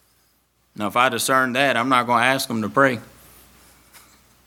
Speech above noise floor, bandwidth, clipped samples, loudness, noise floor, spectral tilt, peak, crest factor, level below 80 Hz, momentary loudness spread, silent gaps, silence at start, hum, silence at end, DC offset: 44 dB; 19 kHz; under 0.1%; -19 LUFS; -63 dBFS; -3.5 dB/octave; -2 dBFS; 22 dB; -62 dBFS; 6 LU; none; 0.8 s; none; 1.4 s; under 0.1%